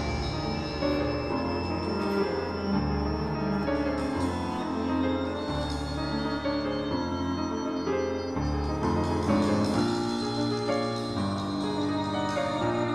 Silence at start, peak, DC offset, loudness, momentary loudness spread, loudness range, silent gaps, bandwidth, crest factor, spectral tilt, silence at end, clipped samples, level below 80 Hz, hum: 0 s; -12 dBFS; under 0.1%; -29 LUFS; 4 LU; 2 LU; none; 12.5 kHz; 16 dB; -6.5 dB/octave; 0 s; under 0.1%; -42 dBFS; none